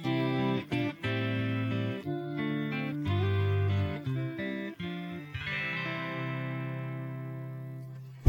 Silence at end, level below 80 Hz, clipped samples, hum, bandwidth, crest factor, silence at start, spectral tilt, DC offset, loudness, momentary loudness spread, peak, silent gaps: 0 s; -62 dBFS; under 0.1%; none; 16 kHz; 24 dB; 0 s; -8 dB/octave; under 0.1%; -33 LUFS; 10 LU; -8 dBFS; none